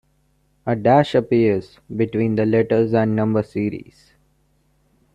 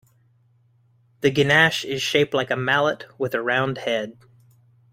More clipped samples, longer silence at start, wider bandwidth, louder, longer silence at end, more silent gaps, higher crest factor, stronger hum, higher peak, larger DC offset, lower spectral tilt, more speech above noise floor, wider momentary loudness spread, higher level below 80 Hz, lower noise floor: neither; second, 0.65 s vs 1.2 s; second, 9.2 kHz vs 16 kHz; about the same, -19 LUFS vs -21 LUFS; first, 1.35 s vs 0.8 s; neither; about the same, 18 dB vs 22 dB; neither; about the same, -2 dBFS vs -2 dBFS; neither; first, -8.5 dB/octave vs -4.5 dB/octave; first, 44 dB vs 39 dB; about the same, 10 LU vs 10 LU; first, -54 dBFS vs -60 dBFS; about the same, -62 dBFS vs -60 dBFS